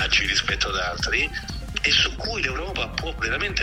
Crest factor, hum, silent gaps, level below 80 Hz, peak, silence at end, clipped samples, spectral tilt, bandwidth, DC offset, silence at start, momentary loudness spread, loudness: 18 dB; none; none; -34 dBFS; -6 dBFS; 0 s; under 0.1%; -2.5 dB/octave; 15.5 kHz; under 0.1%; 0 s; 9 LU; -23 LUFS